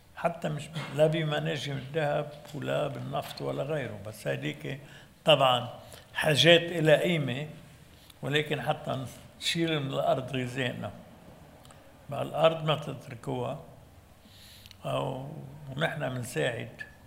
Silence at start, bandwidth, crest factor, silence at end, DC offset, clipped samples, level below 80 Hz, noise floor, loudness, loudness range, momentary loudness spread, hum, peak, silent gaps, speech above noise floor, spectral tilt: 0.15 s; 16 kHz; 26 dB; 0.15 s; under 0.1%; under 0.1%; -64 dBFS; -54 dBFS; -29 LUFS; 10 LU; 18 LU; none; -4 dBFS; none; 25 dB; -5 dB/octave